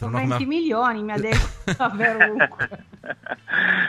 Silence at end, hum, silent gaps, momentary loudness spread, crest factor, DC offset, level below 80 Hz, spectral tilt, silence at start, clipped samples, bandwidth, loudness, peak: 0 s; none; none; 15 LU; 20 dB; under 0.1%; -34 dBFS; -5.5 dB/octave; 0 s; under 0.1%; 13.5 kHz; -21 LUFS; -2 dBFS